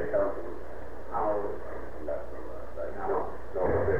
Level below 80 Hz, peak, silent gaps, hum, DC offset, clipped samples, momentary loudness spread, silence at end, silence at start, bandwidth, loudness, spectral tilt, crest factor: -46 dBFS; -16 dBFS; none; none; 3%; under 0.1%; 12 LU; 0 s; 0 s; 14 kHz; -34 LUFS; -8.5 dB/octave; 16 dB